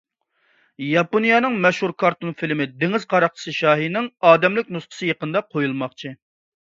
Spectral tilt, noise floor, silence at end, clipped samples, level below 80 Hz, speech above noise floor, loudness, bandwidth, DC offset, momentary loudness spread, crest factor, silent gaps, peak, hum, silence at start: -6 dB/octave; -66 dBFS; 0.6 s; under 0.1%; -68 dBFS; 46 dB; -20 LUFS; 7.8 kHz; under 0.1%; 12 LU; 20 dB; none; 0 dBFS; none; 0.8 s